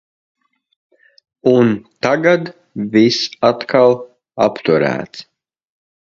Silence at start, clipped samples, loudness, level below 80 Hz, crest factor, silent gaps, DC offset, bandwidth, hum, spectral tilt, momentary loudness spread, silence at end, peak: 1.45 s; under 0.1%; -15 LUFS; -58 dBFS; 16 dB; none; under 0.1%; 7.6 kHz; none; -5.5 dB/octave; 13 LU; 0.8 s; 0 dBFS